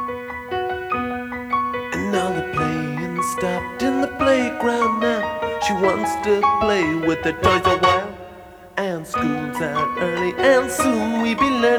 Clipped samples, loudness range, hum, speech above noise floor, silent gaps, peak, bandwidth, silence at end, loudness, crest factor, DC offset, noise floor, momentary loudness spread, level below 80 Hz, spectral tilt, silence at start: under 0.1%; 4 LU; none; 22 dB; none; -2 dBFS; over 20 kHz; 0 s; -20 LUFS; 18 dB; under 0.1%; -41 dBFS; 8 LU; -46 dBFS; -5 dB/octave; 0 s